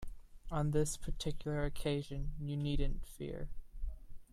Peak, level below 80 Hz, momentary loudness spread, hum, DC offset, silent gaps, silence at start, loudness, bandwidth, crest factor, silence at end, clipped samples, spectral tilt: -20 dBFS; -42 dBFS; 15 LU; none; under 0.1%; none; 0 s; -40 LUFS; 13.5 kHz; 16 dB; 0.1 s; under 0.1%; -6 dB/octave